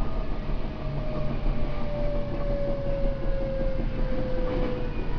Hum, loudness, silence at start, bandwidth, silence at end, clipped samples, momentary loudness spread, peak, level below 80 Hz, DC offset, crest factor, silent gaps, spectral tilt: none; -31 LUFS; 0 s; 5.4 kHz; 0 s; under 0.1%; 4 LU; -14 dBFS; -28 dBFS; under 0.1%; 12 dB; none; -9 dB/octave